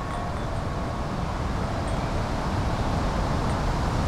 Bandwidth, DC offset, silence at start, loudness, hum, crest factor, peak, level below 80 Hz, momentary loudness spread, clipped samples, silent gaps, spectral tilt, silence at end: 13.5 kHz; under 0.1%; 0 s; -28 LUFS; none; 14 dB; -12 dBFS; -32 dBFS; 4 LU; under 0.1%; none; -6.5 dB/octave; 0 s